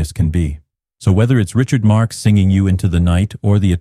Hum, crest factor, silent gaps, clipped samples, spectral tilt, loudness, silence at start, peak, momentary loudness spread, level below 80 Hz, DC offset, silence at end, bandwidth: none; 12 dB; none; under 0.1%; -7 dB/octave; -15 LUFS; 0 s; -2 dBFS; 6 LU; -30 dBFS; under 0.1%; 0 s; 13 kHz